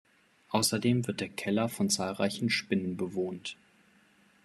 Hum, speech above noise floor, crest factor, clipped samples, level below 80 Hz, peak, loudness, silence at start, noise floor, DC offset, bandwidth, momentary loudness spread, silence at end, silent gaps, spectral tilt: none; 33 dB; 20 dB; under 0.1%; -72 dBFS; -12 dBFS; -31 LUFS; 0.5 s; -64 dBFS; under 0.1%; 13.5 kHz; 8 LU; 0.9 s; none; -4 dB/octave